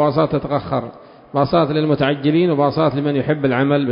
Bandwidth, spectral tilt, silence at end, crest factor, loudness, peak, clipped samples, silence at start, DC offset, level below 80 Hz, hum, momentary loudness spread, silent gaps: 5.4 kHz; -12 dB/octave; 0 s; 14 dB; -18 LUFS; -2 dBFS; under 0.1%; 0 s; under 0.1%; -48 dBFS; none; 7 LU; none